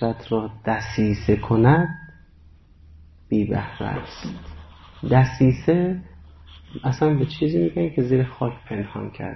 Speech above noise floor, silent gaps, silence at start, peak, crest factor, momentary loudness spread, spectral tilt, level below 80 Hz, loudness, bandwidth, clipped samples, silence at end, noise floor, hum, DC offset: 29 dB; none; 0 s; -4 dBFS; 18 dB; 16 LU; -8.5 dB/octave; -42 dBFS; -22 LUFS; 6.2 kHz; under 0.1%; 0 s; -50 dBFS; none; under 0.1%